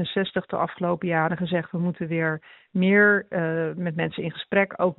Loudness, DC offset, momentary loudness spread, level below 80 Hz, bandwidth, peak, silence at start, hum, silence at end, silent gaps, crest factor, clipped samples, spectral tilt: -24 LUFS; under 0.1%; 10 LU; -64 dBFS; 4.2 kHz; -6 dBFS; 0 s; none; 0.05 s; none; 18 dB; under 0.1%; -5 dB/octave